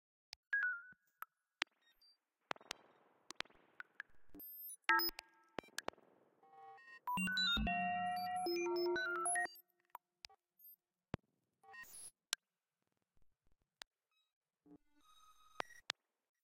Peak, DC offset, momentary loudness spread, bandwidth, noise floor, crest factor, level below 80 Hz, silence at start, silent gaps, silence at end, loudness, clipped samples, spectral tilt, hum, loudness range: -12 dBFS; under 0.1%; 24 LU; 16 kHz; under -90 dBFS; 34 dB; -64 dBFS; 0.5 s; 13.87-13.91 s, 14.33-14.41 s; 0.65 s; -41 LUFS; under 0.1%; -2.5 dB/octave; none; 14 LU